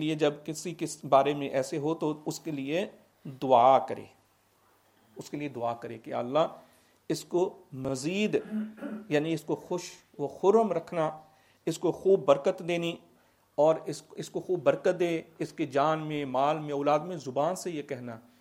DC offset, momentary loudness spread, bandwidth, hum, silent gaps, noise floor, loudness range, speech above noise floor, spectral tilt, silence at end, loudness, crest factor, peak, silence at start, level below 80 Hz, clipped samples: under 0.1%; 14 LU; 16 kHz; none; none; -66 dBFS; 4 LU; 38 dB; -5.5 dB/octave; 0.2 s; -29 LUFS; 22 dB; -8 dBFS; 0 s; -74 dBFS; under 0.1%